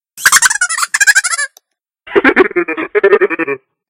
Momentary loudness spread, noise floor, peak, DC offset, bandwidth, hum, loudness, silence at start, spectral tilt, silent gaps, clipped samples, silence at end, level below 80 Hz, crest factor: 9 LU; -53 dBFS; 0 dBFS; under 0.1%; over 20 kHz; none; -11 LUFS; 0.15 s; -0.5 dB/octave; none; 0.3%; 0.35 s; -52 dBFS; 12 dB